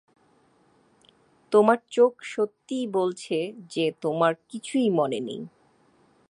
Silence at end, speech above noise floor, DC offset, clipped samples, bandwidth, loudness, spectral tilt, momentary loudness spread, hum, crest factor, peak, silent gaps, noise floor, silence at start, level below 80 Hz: 0.8 s; 38 dB; under 0.1%; under 0.1%; 11 kHz; -25 LUFS; -5.5 dB/octave; 11 LU; none; 22 dB; -6 dBFS; none; -63 dBFS; 1.5 s; -78 dBFS